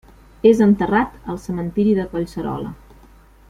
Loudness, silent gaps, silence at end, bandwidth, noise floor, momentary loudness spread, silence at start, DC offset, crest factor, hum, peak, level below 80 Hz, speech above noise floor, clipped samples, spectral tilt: -19 LUFS; none; 0.75 s; 11 kHz; -47 dBFS; 14 LU; 0.45 s; under 0.1%; 18 dB; none; -2 dBFS; -44 dBFS; 29 dB; under 0.1%; -8 dB/octave